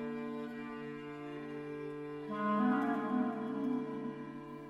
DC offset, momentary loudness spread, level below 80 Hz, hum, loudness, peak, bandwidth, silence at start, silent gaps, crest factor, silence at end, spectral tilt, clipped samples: under 0.1%; 13 LU; -74 dBFS; none; -38 LUFS; -20 dBFS; 7.8 kHz; 0 s; none; 18 dB; 0 s; -8 dB/octave; under 0.1%